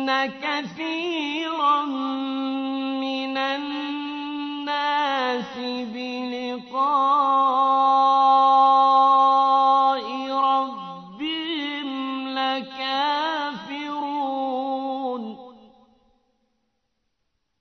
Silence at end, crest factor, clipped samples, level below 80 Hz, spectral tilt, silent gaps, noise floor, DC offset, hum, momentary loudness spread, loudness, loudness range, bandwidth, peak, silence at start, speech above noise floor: 2.05 s; 14 dB; under 0.1%; -72 dBFS; -4 dB/octave; none; -76 dBFS; under 0.1%; none; 14 LU; -22 LUFS; 11 LU; 6.4 kHz; -8 dBFS; 0 s; 53 dB